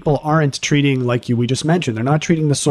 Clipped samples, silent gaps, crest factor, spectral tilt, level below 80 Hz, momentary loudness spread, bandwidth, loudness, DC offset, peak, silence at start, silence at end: under 0.1%; none; 14 dB; -5.5 dB/octave; -46 dBFS; 3 LU; 12 kHz; -17 LUFS; under 0.1%; -2 dBFS; 0 s; 0 s